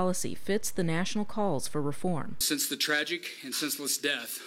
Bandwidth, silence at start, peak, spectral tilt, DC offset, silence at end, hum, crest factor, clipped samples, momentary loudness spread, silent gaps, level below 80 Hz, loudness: 17 kHz; 0 s; -16 dBFS; -3 dB/octave; under 0.1%; 0 s; none; 16 dB; under 0.1%; 6 LU; none; -60 dBFS; -30 LUFS